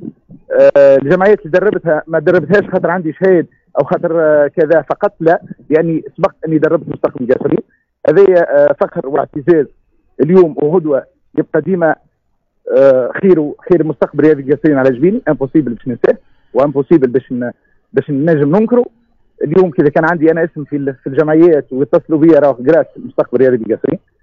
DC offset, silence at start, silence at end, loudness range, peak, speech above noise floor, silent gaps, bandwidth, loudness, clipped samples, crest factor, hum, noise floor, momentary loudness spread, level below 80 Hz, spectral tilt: under 0.1%; 0 s; 0.25 s; 3 LU; 0 dBFS; 51 dB; none; 6.2 kHz; -12 LUFS; under 0.1%; 12 dB; none; -62 dBFS; 10 LU; -50 dBFS; -9.5 dB/octave